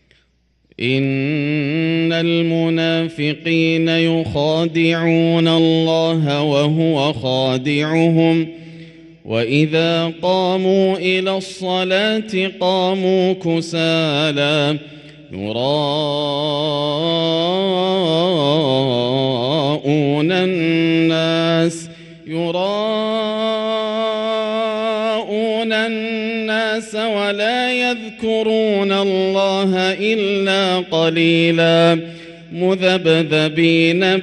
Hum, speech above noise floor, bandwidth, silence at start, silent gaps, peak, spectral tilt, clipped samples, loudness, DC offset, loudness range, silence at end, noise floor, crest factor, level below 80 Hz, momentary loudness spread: none; 44 dB; 11 kHz; 0.8 s; none; 0 dBFS; -6 dB/octave; under 0.1%; -17 LUFS; under 0.1%; 4 LU; 0 s; -60 dBFS; 16 dB; -58 dBFS; 7 LU